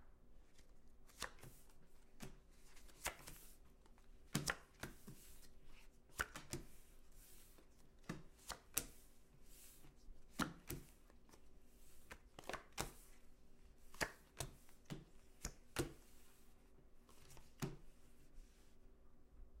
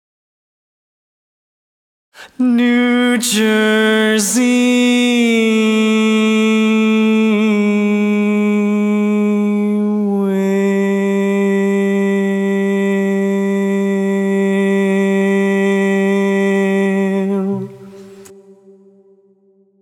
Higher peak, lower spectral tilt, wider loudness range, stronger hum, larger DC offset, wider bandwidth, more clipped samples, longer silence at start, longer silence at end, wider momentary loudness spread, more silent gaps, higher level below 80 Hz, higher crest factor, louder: second, -14 dBFS vs -2 dBFS; second, -3 dB/octave vs -5.5 dB/octave; about the same, 5 LU vs 4 LU; neither; neither; about the same, 16 kHz vs 16.5 kHz; neither; second, 0 s vs 2.2 s; second, 0 s vs 1.5 s; first, 22 LU vs 4 LU; neither; first, -62 dBFS vs -72 dBFS; first, 40 dB vs 12 dB; second, -51 LUFS vs -14 LUFS